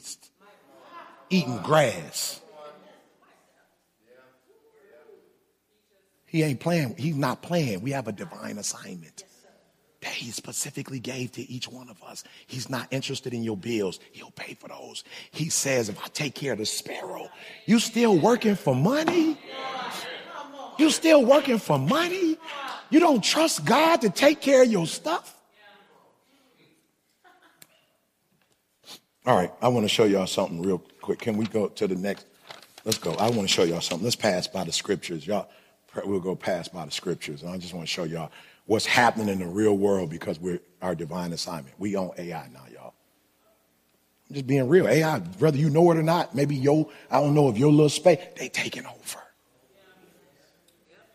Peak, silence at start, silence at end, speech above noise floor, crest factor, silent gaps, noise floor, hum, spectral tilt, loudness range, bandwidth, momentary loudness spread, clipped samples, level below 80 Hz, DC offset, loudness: -6 dBFS; 0.05 s; 1.9 s; 45 dB; 20 dB; none; -70 dBFS; none; -5 dB/octave; 12 LU; 15.5 kHz; 19 LU; under 0.1%; -68 dBFS; under 0.1%; -25 LUFS